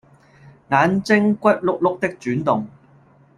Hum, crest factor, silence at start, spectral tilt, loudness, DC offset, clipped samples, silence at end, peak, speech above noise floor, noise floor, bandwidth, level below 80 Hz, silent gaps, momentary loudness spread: none; 18 dB; 0.7 s; -7 dB/octave; -19 LUFS; under 0.1%; under 0.1%; 0.7 s; -2 dBFS; 33 dB; -52 dBFS; 11 kHz; -58 dBFS; none; 7 LU